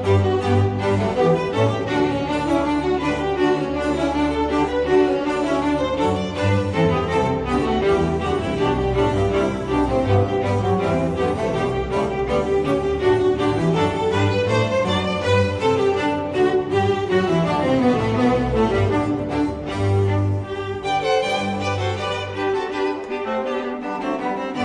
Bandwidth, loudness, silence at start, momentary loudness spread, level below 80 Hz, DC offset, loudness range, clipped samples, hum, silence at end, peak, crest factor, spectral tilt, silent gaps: 10.5 kHz; -20 LUFS; 0 s; 5 LU; -38 dBFS; under 0.1%; 3 LU; under 0.1%; none; 0 s; -6 dBFS; 14 dB; -7 dB/octave; none